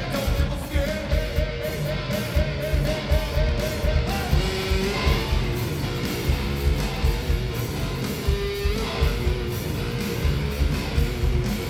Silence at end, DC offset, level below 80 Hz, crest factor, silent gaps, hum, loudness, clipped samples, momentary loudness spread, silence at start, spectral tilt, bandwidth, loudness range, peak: 0 s; under 0.1%; -26 dBFS; 16 dB; none; none; -25 LUFS; under 0.1%; 4 LU; 0 s; -5.5 dB/octave; 16.5 kHz; 2 LU; -6 dBFS